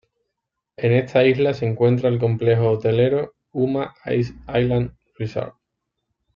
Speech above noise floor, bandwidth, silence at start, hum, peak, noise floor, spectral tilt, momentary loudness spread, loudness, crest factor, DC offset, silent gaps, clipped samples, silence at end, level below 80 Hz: 61 dB; 6.8 kHz; 0.8 s; none; -4 dBFS; -80 dBFS; -9 dB/octave; 11 LU; -20 LUFS; 16 dB; under 0.1%; none; under 0.1%; 0.85 s; -50 dBFS